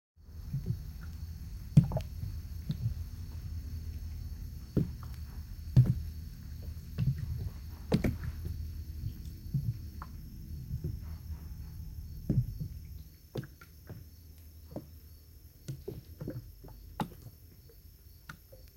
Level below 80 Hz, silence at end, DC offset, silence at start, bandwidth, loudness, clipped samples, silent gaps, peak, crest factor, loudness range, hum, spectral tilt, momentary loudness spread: -46 dBFS; 0 s; under 0.1%; 0.2 s; 16.5 kHz; -37 LUFS; under 0.1%; none; -10 dBFS; 26 dB; 12 LU; none; -8 dB/octave; 21 LU